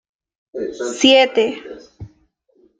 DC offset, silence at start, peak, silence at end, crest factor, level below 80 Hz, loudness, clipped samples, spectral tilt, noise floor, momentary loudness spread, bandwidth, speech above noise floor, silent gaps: under 0.1%; 0.55 s; -2 dBFS; 0.7 s; 18 dB; -56 dBFS; -15 LUFS; under 0.1%; -2.5 dB/octave; -59 dBFS; 24 LU; 9.4 kHz; 43 dB; none